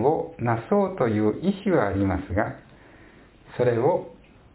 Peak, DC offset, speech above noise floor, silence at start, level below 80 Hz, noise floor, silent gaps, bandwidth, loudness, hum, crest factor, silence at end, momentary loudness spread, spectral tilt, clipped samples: -8 dBFS; under 0.1%; 28 dB; 0 s; -46 dBFS; -51 dBFS; none; 4 kHz; -24 LUFS; none; 18 dB; 0.4 s; 8 LU; -12 dB/octave; under 0.1%